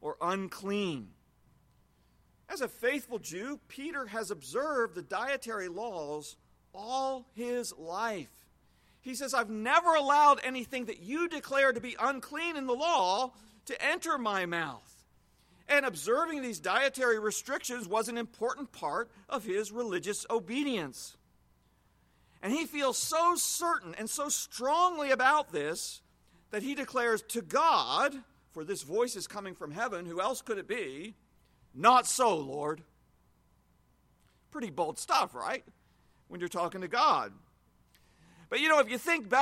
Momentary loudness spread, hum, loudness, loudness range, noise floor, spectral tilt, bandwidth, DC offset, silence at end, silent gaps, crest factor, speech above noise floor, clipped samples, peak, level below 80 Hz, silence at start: 14 LU; none; -31 LUFS; 8 LU; -68 dBFS; -2.5 dB/octave; 16.5 kHz; under 0.1%; 0 s; none; 22 dB; 37 dB; under 0.1%; -10 dBFS; -70 dBFS; 0 s